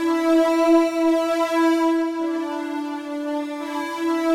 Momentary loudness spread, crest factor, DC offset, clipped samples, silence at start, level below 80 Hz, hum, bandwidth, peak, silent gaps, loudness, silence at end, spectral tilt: 10 LU; 14 dB; under 0.1%; under 0.1%; 0 s; -64 dBFS; none; 15.5 kHz; -6 dBFS; none; -21 LUFS; 0 s; -3 dB/octave